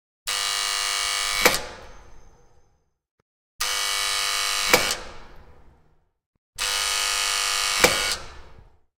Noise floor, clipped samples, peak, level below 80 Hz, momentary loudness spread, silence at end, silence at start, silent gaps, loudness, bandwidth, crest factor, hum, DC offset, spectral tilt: -63 dBFS; under 0.1%; 0 dBFS; -48 dBFS; 10 LU; 0.35 s; 0.25 s; 3.11-3.59 s, 6.26-6.53 s; -22 LUFS; 19 kHz; 26 dB; none; under 0.1%; 0 dB/octave